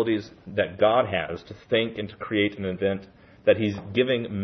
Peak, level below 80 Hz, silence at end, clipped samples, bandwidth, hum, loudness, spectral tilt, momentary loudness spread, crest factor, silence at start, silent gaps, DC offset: -6 dBFS; -60 dBFS; 0 s; under 0.1%; 6.2 kHz; none; -25 LUFS; -7.5 dB/octave; 11 LU; 20 dB; 0 s; none; under 0.1%